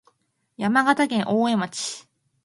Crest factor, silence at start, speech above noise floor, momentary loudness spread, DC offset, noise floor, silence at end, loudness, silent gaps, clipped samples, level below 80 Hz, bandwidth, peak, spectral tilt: 20 dB; 0.6 s; 43 dB; 11 LU; under 0.1%; -65 dBFS; 0.45 s; -22 LUFS; none; under 0.1%; -70 dBFS; 11.5 kHz; -4 dBFS; -4 dB/octave